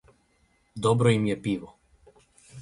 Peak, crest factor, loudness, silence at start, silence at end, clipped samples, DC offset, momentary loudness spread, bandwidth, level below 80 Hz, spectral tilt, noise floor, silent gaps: -8 dBFS; 20 dB; -25 LUFS; 0.75 s; 0 s; under 0.1%; under 0.1%; 12 LU; 11.5 kHz; -58 dBFS; -6.5 dB/octave; -67 dBFS; none